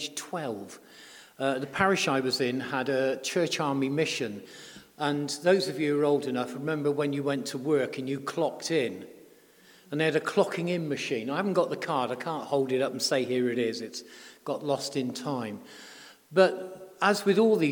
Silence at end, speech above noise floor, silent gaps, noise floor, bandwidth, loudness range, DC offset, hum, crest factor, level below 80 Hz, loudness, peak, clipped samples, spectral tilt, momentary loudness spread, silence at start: 0 s; 29 dB; none; -57 dBFS; 19 kHz; 3 LU; under 0.1%; none; 22 dB; -74 dBFS; -28 LUFS; -8 dBFS; under 0.1%; -4.5 dB/octave; 18 LU; 0 s